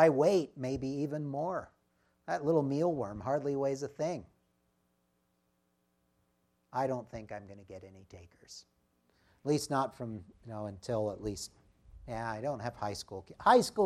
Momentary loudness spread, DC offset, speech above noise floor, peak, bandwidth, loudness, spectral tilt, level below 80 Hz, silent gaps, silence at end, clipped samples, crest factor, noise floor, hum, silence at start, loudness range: 21 LU; under 0.1%; 44 dB; -12 dBFS; 14.5 kHz; -34 LUFS; -6 dB/octave; -64 dBFS; none; 0 s; under 0.1%; 24 dB; -77 dBFS; none; 0 s; 9 LU